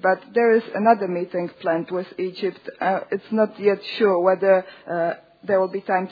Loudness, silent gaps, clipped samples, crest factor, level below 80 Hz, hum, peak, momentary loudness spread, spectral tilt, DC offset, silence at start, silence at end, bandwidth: -22 LUFS; none; under 0.1%; 20 dB; -76 dBFS; none; -2 dBFS; 10 LU; -8.5 dB/octave; under 0.1%; 0 s; 0 s; 5 kHz